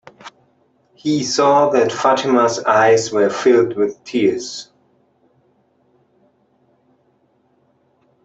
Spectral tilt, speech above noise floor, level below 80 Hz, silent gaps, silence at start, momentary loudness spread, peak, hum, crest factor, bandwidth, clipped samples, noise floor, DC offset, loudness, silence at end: -4 dB/octave; 45 dB; -64 dBFS; none; 0.25 s; 9 LU; -2 dBFS; none; 16 dB; 8.2 kHz; under 0.1%; -60 dBFS; under 0.1%; -16 LUFS; 3.6 s